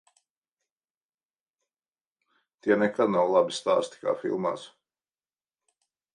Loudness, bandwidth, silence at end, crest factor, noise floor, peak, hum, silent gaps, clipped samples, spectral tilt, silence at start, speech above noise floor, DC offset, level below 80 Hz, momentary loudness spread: -26 LUFS; 11 kHz; 1.45 s; 22 dB; under -90 dBFS; -8 dBFS; none; none; under 0.1%; -5 dB/octave; 2.65 s; over 65 dB; under 0.1%; -76 dBFS; 9 LU